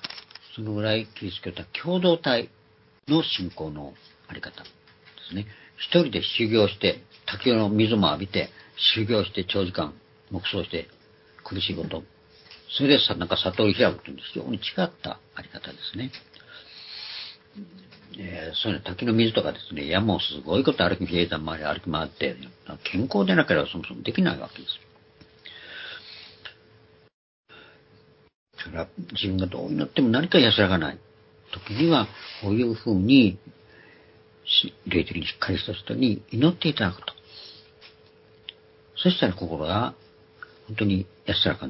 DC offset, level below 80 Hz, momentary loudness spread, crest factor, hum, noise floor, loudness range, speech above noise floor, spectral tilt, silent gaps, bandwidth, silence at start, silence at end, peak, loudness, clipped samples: under 0.1%; -50 dBFS; 21 LU; 22 dB; none; -57 dBFS; 11 LU; 32 dB; -9.5 dB/octave; 27.14-27.44 s, 28.35-28.46 s; 5.8 kHz; 0.05 s; 0 s; -4 dBFS; -25 LUFS; under 0.1%